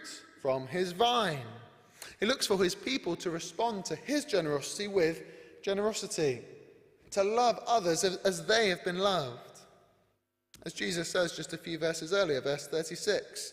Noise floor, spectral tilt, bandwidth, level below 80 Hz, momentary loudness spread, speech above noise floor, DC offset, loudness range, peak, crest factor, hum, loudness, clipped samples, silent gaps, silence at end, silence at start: -77 dBFS; -3.5 dB/octave; 15.5 kHz; -68 dBFS; 13 LU; 46 dB; under 0.1%; 4 LU; -14 dBFS; 18 dB; none; -31 LUFS; under 0.1%; none; 0 s; 0 s